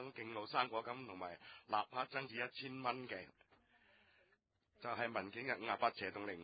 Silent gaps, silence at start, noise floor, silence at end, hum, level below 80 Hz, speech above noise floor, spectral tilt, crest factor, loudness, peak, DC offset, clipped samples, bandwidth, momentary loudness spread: none; 0 s; -80 dBFS; 0 s; none; -82 dBFS; 36 dB; -2 dB/octave; 24 dB; -43 LUFS; -20 dBFS; under 0.1%; under 0.1%; 4.9 kHz; 11 LU